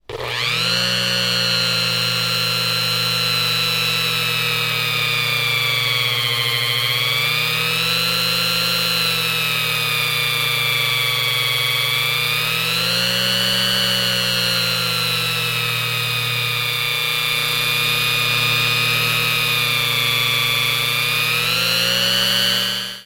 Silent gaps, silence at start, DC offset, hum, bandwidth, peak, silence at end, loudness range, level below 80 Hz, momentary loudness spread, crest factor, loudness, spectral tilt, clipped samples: none; 0.1 s; under 0.1%; none; 16.5 kHz; -4 dBFS; 0 s; 1 LU; -54 dBFS; 2 LU; 14 dB; -16 LUFS; -2 dB/octave; under 0.1%